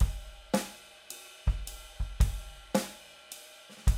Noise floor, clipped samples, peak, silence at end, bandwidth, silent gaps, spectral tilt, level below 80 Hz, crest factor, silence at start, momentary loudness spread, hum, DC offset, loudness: -51 dBFS; under 0.1%; -12 dBFS; 0 s; 16 kHz; none; -5 dB/octave; -34 dBFS; 20 dB; 0 s; 14 LU; none; under 0.1%; -35 LUFS